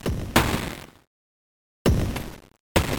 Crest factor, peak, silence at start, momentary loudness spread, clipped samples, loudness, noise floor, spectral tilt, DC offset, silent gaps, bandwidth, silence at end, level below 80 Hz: 24 dB; -2 dBFS; 0.05 s; 14 LU; under 0.1%; -25 LUFS; under -90 dBFS; -5 dB/octave; under 0.1%; 1.07-1.85 s, 2.60-2.75 s; 17.5 kHz; 0 s; -34 dBFS